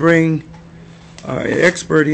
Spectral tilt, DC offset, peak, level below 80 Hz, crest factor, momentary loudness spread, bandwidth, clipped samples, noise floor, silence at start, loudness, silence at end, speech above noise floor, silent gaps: -6 dB/octave; under 0.1%; 0 dBFS; -48 dBFS; 16 dB; 12 LU; 8.6 kHz; under 0.1%; -39 dBFS; 0 s; -16 LUFS; 0 s; 25 dB; none